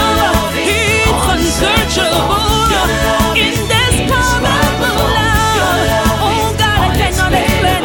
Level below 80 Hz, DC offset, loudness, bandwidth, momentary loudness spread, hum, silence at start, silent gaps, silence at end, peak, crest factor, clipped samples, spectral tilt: -22 dBFS; under 0.1%; -12 LUFS; 19 kHz; 2 LU; none; 0 s; none; 0 s; 0 dBFS; 12 dB; under 0.1%; -4 dB/octave